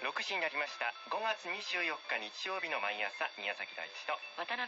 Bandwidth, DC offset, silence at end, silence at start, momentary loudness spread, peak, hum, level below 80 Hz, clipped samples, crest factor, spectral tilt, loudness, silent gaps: 7.6 kHz; under 0.1%; 0 s; 0 s; 5 LU; -22 dBFS; none; under -90 dBFS; under 0.1%; 18 dB; 2.5 dB/octave; -37 LUFS; none